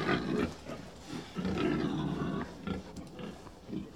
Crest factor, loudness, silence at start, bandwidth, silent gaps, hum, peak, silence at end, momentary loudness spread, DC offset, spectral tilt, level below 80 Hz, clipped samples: 20 dB; -37 LUFS; 0 s; 14.5 kHz; none; none; -16 dBFS; 0 s; 14 LU; 0.1%; -6.5 dB/octave; -54 dBFS; under 0.1%